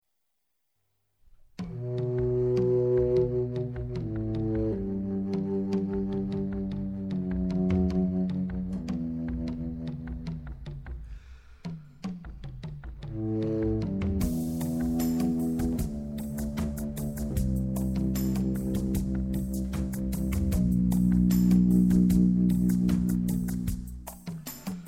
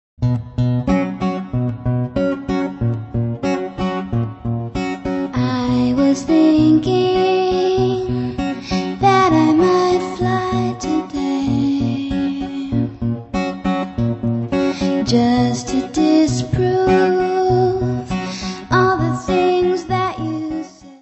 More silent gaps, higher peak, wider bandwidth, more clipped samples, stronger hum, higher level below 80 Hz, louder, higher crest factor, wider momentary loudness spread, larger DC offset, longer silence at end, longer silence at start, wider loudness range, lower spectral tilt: neither; second, -12 dBFS vs 0 dBFS; first, 16.5 kHz vs 8.4 kHz; neither; neither; about the same, -38 dBFS vs -38 dBFS; second, -28 LUFS vs -18 LUFS; about the same, 18 dB vs 16 dB; first, 16 LU vs 9 LU; neither; about the same, 0 s vs 0.05 s; first, 1.6 s vs 0.2 s; first, 11 LU vs 5 LU; first, -8 dB/octave vs -6.5 dB/octave